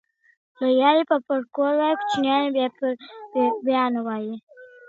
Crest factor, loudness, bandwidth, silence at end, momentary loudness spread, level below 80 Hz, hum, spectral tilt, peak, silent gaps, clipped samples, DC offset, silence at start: 18 dB; -22 LUFS; 7.8 kHz; 0.2 s; 11 LU; -74 dBFS; none; -5 dB/octave; -4 dBFS; 4.43-4.47 s; under 0.1%; under 0.1%; 0.6 s